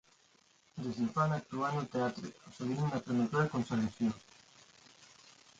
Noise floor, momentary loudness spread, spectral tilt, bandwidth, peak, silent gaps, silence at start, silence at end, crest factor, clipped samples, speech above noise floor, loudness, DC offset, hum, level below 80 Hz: -68 dBFS; 15 LU; -7 dB/octave; 8.8 kHz; -18 dBFS; none; 0.75 s; 0.55 s; 20 dB; under 0.1%; 34 dB; -35 LUFS; under 0.1%; none; -68 dBFS